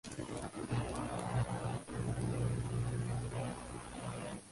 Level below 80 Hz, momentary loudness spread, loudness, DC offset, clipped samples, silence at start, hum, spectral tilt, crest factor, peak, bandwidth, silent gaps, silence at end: -52 dBFS; 7 LU; -40 LUFS; under 0.1%; under 0.1%; 0.05 s; 60 Hz at -40 dBFS; -6 dB/octave; 14 dB; -24 dBFS; 11.5 kHz; none; 0 s